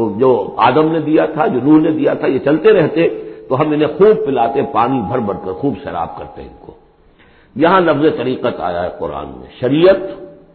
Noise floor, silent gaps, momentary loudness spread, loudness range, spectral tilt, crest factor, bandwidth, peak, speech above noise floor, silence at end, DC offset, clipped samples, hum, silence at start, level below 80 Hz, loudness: -47 dBFS; none; 14 LU; 5 LU; -12 dB/octave; 14 dB; 4.5 kHz; 0 dBFS; 34 dB; 0.2 s; under 0.1%; under 0.1%; none; 0 s; -46 dBFS; -14 LUFS